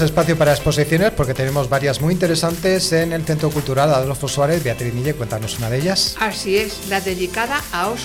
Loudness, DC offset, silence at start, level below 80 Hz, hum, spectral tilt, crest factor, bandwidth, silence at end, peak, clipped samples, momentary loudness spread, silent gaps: -18 LUFS; under 0.1%; 0 s; -38 dBFS; none; -5 dB/octave; 12 dB; 19 kHz; 0 s; -6 dBFS; under 0.1%; 6 LU; none